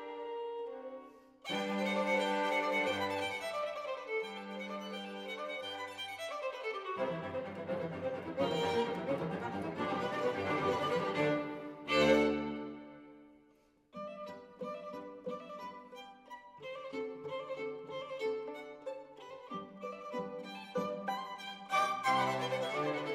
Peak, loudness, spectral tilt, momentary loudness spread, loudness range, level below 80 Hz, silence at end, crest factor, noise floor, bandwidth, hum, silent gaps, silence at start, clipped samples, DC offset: -16 dBFS; -37 LUFS; -5 dB/octave; 15 LU; 12 LU; -72 dBFS; 0 s; 22 dB; -68 dBFS; 16 kHz; none; none; 0 s; under 0.1%; under 0.1%